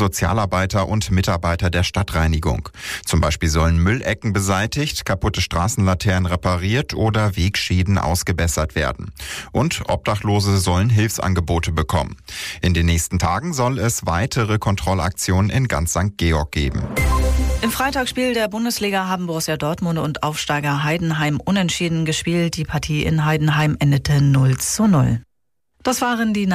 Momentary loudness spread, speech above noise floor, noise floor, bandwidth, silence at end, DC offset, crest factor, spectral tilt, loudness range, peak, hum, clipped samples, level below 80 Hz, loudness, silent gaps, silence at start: 5 LU; 55 dB; -74 dBFS; 15.5 kHz; 0 s; under 0.1%; 10 dB; -5 dB/octave; 2 LU; -8 dBFS; none; under 0.1%; -30 dBFS; -19 LUFS; none; 0 s